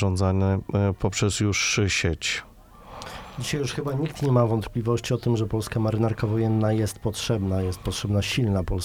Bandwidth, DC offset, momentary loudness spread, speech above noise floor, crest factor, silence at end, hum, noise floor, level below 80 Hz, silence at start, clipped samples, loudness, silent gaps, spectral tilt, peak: 15.5 kHz; 0.1%; 7 LU; 20 dB; 16 dB; 0 s; none; -44 dBFS; -44 dBFS; 0 s; under 0.1%; -25 LUFS; none; -5 dB/octave; -8 dBFS